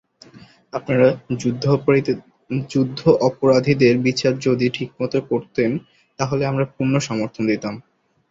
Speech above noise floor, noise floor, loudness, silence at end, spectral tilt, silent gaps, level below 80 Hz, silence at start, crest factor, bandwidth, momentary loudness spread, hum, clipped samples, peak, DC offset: 28 dB; -47 dBFS; -20 LUFS; 0.5 s; -6.5 dB/octave; none; -56 dBFS; 0.35 s; 18 dB; 7.8 kHz; 11 LU; none; under 0.1%; -2 dBFS; under 0.1%